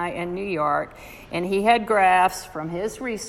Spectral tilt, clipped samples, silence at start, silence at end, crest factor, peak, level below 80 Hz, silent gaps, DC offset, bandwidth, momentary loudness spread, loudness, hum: -4.5 dB/octave; under 0.1%; 0 s; 0 s; 18 dB; -6 dBFS; -52 dBFS; none; under 0.1%; 16 kHz; 14 LU; -22 LUFS; none